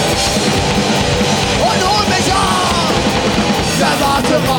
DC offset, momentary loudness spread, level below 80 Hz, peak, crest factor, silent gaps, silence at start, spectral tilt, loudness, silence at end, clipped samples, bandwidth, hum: under 0.1%; 1 LU; -30 dBFS; -2 dBFS; 12 dB; none; 0 s; -3.5 dB/octave; -13 LUFS; 0 s; under 0.1%; 19 kHz; none